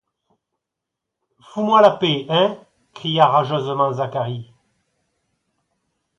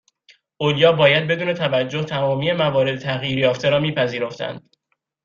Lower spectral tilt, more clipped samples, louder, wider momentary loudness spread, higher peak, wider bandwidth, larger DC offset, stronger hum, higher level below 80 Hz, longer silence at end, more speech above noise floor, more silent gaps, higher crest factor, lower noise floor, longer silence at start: about the same, -6.5 dB/octave vs -6 dB/octave; neither; about the same, -18 LUFS vs -19 LUFS; first, 15 LU vs 10 LU; about the same, 0 dBFS vs -2 dBFS; about the same, 7.6 kHz vs 7.2 kHz; neither; neither; second, -66 dBFS vs -58 dBFS; first, 1.75 s vs 0.65 s; first, 65 dB vs 54 dB; neither; about the same, 22 dB vs 18 dB; first, -83 dBFS vs -73 dBFS; first, 1.55 s vs 0.6 s